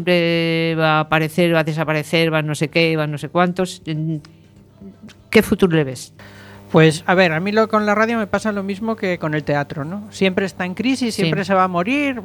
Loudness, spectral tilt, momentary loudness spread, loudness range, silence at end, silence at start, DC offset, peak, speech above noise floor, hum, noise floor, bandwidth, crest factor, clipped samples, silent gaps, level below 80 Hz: -18 LUFS; -6 dB/octave; 9 LU; 4 LU; 0 s; 0 s; under 0.1%; 0 dBFS; 26 dB; none; -44 dBFS; 19 kHz; 18 dB; under 0.1%; none; -50 dBFS